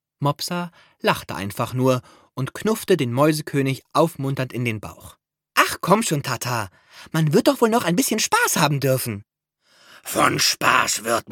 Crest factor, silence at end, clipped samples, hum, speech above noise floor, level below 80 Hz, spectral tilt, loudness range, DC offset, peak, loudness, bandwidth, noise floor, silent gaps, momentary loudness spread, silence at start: 22 dB; 0 s; under 0.1%; none; 41 dB; -58 dBFS; -4 dB/octave; 3 LU; under 0.1%; 0 dBFS; -21 LUFS; 17.5 kHz; -63 dBFS; none; 12 LU; 0.2 s